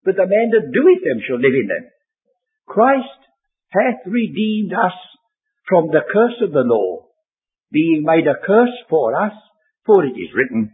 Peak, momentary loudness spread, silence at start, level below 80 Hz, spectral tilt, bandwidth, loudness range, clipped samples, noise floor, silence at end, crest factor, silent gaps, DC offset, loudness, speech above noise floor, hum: 0 dBFS; 9 LU; 0.05 s; -66 dBFS; -10.5 dB/octave; 4 kHz; 3 LU; under 0.1%; -84 dBFS; 0.05 s; 16 dB; none; under 0.1%; -16 LUFS; 69 dB; none